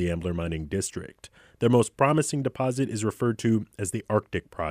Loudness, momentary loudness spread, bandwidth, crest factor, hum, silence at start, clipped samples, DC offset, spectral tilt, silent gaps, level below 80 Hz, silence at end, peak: -27 LUFS; 10 LU; 15.5 kHz; 20 dB; none; 0 s; under 0.1%; under 0.1%; -6 dB/octave; none; -52 dBFS; 0 s; -6 dBFS